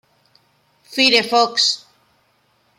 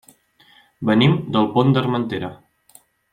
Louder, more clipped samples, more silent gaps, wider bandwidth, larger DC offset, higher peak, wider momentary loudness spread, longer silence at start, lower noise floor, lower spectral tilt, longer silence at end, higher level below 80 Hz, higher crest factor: first, -16 LUFS vs -19 LUFS; neither; neither; first, 16.5 kHz vs 14.5 kHz; neither; about the same, -2 dBFS vs -2 dBFS; about the same, 13 LU vs 11 LU; about the same, 0.9 s vs 0.8 s; first, -61 dBFS vs -54 dBFS; second, -1 dB/octave vs -8 dB/octave; first, 1 s vs 0.8 s; second, -74 dBFS vs -56 dBFS; about the same, 20 dB vs 18 dB